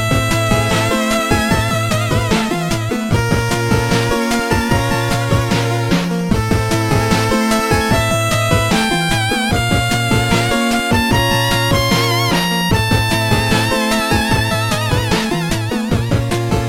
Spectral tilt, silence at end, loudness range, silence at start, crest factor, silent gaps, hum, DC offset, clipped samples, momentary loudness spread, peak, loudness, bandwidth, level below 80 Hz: -4.5 dB/octave; 0 s; 2 LU; 0 s; 14 dB; none; none; under 0.1%; under 0.1%; 3 LU; 0 dBFS; -15 LUFS; 16.5 kHz; -28 dBFS